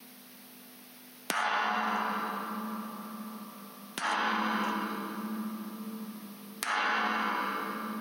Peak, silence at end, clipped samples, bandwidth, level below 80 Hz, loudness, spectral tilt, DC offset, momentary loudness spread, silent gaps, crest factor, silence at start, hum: -6 dBFS; 0 s; under 0.1%; 16 kHz; under -90 dBFS; -33 LUFS; -3 dB/octave; under 0.1%; 20 LU; none; 28 dB; 0 s; none